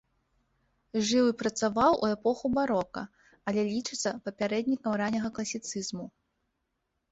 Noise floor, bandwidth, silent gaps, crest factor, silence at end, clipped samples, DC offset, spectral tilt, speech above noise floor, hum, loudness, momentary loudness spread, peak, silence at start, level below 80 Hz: -80 dBFS; 8.2 kHz; none; 20 dB; 1.05 s; under 0.1%; under 0.1%; -4 dB/octave; 51 dB; none; -29 LUFS; 13 LU; -10 dBFS; 0.95 s; -64 dBFS